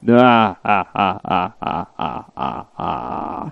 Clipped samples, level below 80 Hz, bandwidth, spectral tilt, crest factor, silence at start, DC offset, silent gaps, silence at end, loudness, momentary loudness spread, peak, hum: under 0.1%; -50 dBFS; 6 kHz; -8 dB/octave; 18 dB; 0 s; under 0.1%; none; 0 s; -19 LUFS; 14 LU; 0 dBFS; none